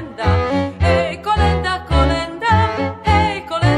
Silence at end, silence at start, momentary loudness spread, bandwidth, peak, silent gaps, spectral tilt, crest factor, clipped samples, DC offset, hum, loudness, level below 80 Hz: 0 s; 0 s; 4 LU; 10.5 kHz; -2 dBFS; none; -6.5 dB/octave; 14 dB; under 0.1%; under 0.1%; none; -17 LUFS; -24 dBFS